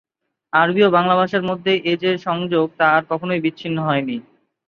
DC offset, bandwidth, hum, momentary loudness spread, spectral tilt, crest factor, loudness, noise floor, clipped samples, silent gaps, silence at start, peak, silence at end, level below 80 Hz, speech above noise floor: under 0.1%; 6.8 kHz; none; 8 LU; -7.5 dB/octave; 18 dB; -18 LUFS; -44 dBFS; under 0.1%; none; 0.55 s; -2 dBFS; 0.45 s; -64 dBFS; 26 dB